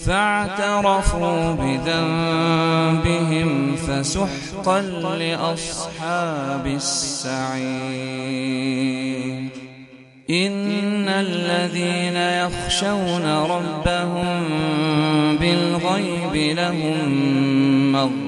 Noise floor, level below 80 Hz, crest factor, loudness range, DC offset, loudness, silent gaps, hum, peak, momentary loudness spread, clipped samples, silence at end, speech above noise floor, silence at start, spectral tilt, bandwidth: -44 dBFS; -38 dBFS; 18 dB; 5 LU; under 0.1%; -21 LUFS; none; none; -4 dBFS; 7 LU; under 0.1%; 0 s; 23 dB; 0 s; -5 dB/octave; 11.5 kHz